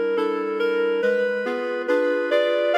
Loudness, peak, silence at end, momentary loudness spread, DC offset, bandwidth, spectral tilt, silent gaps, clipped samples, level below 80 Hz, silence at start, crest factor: -22 LUFS; -8 dBFS; 0 s; 4 LU; under 0.1%; 8.8 kHz; -5 dB/octave; none; under 0.1%; -80 dBFS; 0 s; 12 dB